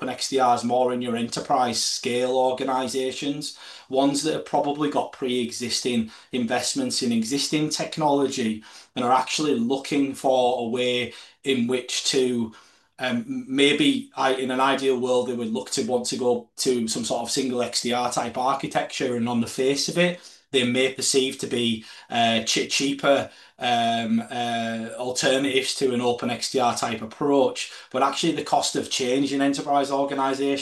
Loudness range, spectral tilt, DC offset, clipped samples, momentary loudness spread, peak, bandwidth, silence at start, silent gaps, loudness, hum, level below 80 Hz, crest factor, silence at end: 2 LU; -3.5 dB/octave; under 0.1%; under 0.1%; 7 LU; -6 dBFS; 12.5 kHz; 0 s; none; -24 LUFS; none; -66 dBFS; 18 dB; 0 s